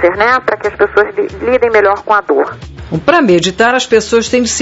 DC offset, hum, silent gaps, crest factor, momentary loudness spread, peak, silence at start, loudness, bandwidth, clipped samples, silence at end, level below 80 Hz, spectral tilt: under 0.1%; none; none; 12 dB; 7 LU; 0 dBFS; 0 s; -11 LUFS; 8 kHz; under 0.1%; 0 s; -38 dBFS; -4 dB/octave